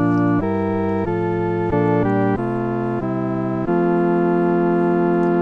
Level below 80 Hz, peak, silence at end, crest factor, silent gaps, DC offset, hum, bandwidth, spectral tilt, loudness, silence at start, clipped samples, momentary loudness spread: -44 dBFS; -6 dBFS; 0 s; 12 dB; none; under 0.1%; none; 4.9 kHz; -10.5 dB/octave; -19 LUFS; 0 s; under 0.1%; 5 LU